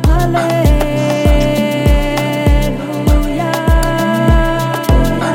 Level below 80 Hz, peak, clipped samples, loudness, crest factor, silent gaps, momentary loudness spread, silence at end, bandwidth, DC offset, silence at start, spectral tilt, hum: -16 dBFS; 0 dBFS; under 0.1%; -13 LUFS; 10 dB; none; 3 LU; 0 s; 17 kHz; under 0.1%; 0 s; -6.5 dB/octave; none